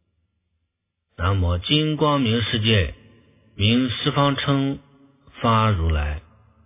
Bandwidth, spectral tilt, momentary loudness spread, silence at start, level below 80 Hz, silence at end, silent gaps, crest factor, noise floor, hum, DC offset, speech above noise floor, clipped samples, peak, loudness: 3.9 kHz; -10.5 dB/octave; 8 LU; 1.2 s; -34 dBFS; 0.45 s; none; 18 dB; -77 dBFS; none; under 0.1%; 57 dB; under 0.1%; -4 dBFS; -21 LUFS